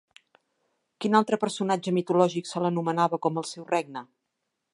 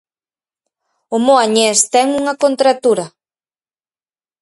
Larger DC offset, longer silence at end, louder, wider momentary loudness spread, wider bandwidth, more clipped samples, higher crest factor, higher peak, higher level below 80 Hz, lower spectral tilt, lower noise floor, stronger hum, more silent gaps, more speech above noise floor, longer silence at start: neither; second, 0.7 s vs 1.35 s; second, -26 LUFS vs -13 LUFS; about the same, 9 LU vs 8 LU; about the same, 11.5 kHz vs 11.5 kHz; neither; first, 22 dB vs 16 dB; second, -6 dBFS vs 0 dBFS; second, -78 dBFS vs -64 dBFS; first, -5.5 dB/octave vs -2 dB/octave; second, -81 dBFS vs under -90 dBFS; neither; neither; second, 55 dB vs over 77 dB; about the same, 1 s vs 1.1 s